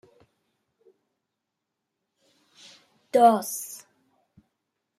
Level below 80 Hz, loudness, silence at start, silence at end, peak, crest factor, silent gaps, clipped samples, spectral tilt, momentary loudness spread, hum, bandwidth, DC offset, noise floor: -82 dBFS; -22 LUFS; 3.15 s; 1.2 s; -6 dBFS; 24 dB; none; under 0.1%; -4 dB/octave; 21 LU; none; 15.5 kHz; under 0.1%; -84 dBFS